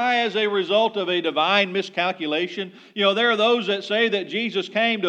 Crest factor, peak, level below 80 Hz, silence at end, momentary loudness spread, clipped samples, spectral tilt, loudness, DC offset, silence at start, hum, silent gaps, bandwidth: 16 dB; -6 dBFS; -90 dBFS; 0 s; 6 LU; under 0.1%; -4.5 dB/octave; -21 LUFS; under 0.1%; 0 s; none; none; 9.2 kHz